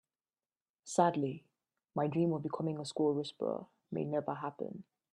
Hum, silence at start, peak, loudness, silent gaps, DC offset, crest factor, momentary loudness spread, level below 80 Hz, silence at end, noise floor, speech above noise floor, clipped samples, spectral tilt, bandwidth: none; 0.85 s; -14 dBFS; -36 LUFS; none; under 0.1%; 22 dB; 13 LU; -80 dBFS; 0.3 s; under -90 dBFS; over 55 dB; under 0.1%; -6.5 dB/octave; 11.5 kHz